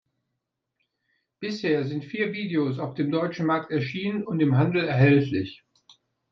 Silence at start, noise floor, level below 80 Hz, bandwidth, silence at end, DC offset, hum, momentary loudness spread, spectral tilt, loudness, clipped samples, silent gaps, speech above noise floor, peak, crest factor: 1.4 s; -82 dBFS; -66 dBFS; 6.4 kHz; 0.75 s; under 0.1%; none; 11 LU; -8.5 dB/octave; -25 LUFS; under 0.1%; none; 57 dB; -8 dBFS; 18 dB